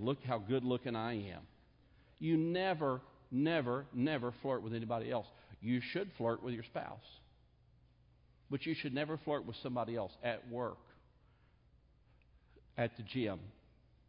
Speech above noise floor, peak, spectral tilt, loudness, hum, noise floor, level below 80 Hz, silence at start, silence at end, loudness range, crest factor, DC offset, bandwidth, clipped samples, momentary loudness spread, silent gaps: 30 dB; -22 dBFS; -5.5 dB/octave; -39 LUFS; none; -68 dBFS; -68 dBFS; 0 s; 0.55 s; 7 LU; 18 dB; under 0.1%; 5.2 kHz; under 0.1%; 11 LU; none